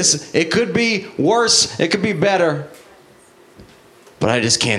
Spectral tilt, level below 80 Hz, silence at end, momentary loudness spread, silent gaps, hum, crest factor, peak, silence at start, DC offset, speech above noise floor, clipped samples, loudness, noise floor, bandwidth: -3 dB/octave; -54 dBFS; 0 s; 7 LU; none; none; 18 dB; 0 dBFS; 0 s; under 0.1%; 31 dB; under 0.1%; -16 LUFS; -48 dBFS; 14.5 kHz